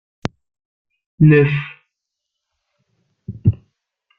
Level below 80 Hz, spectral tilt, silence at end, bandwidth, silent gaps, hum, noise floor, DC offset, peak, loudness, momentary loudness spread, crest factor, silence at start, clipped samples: -46 dBFS; -9 dB/octave; 0.65 s; 6.6 kHz; none; none; -80 dBFS; under 0.1%; -2 dBFS; -16 LUFS; 23 LU; 18 dB; 1.2 s; under 0.1%